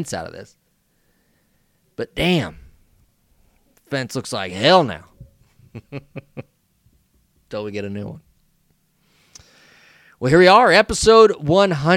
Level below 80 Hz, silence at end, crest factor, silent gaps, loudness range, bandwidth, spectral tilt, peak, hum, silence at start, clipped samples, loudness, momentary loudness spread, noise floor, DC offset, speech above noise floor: -46 dBFS; 0 s; 20 dB; none; 19 LU; 16 kHz; -4.5 dB/octave; 0 dBFS; none; 0 s; under 0.1%; -16 LUFS; 24 LU; -64 dBFS; under 0.1%; 47 dB